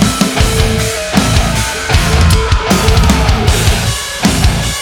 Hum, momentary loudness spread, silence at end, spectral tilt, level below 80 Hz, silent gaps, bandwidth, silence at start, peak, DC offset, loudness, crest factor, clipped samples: none; 4 LU; 0 s; -4.5 dB/octave; -16 dBFS; none; 19.5 kHz; 0 s; 0 dBFS; under 0.1%; -11 LUFS; 10 dB; under 0.1%